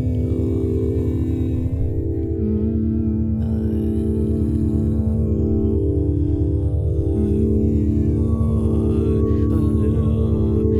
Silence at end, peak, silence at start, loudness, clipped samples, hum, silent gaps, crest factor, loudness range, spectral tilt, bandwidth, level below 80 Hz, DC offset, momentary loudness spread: 0 s; -6 dBFS; 0 s; -20 LUFS; under 0.1%; none; none; 12 dB; 3 LU; -11.5 dB/octave; 3.9 kHz; -24 dBFS; under 0.1%; 3 LU